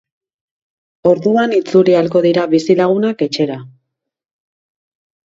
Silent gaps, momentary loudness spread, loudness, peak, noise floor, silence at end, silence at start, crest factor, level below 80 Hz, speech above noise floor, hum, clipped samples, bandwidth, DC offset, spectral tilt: none; 7 LU; -14 LUFS; 0 dBFS; -67 dBFS; 1.7 s; 1.05 s; 16 dB; -62 dBFS; 55 dB; none; under 0.1%; 7.8 kHz; under 0.1%; -6.5 dB/octave